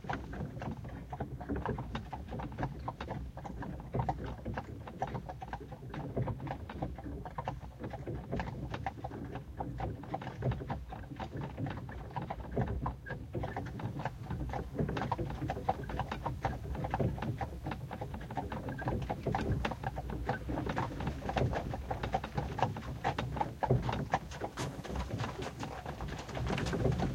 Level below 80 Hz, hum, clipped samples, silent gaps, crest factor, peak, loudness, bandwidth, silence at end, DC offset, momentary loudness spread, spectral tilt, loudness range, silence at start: -46 dBFS; none; under 0.1%; none; 24 dB; -14 dBFS; -39 LUFS; 16.5 kHz; 0 s; under 0.1%; 8 LU; -7 dB/octave; 5 LU; 0 s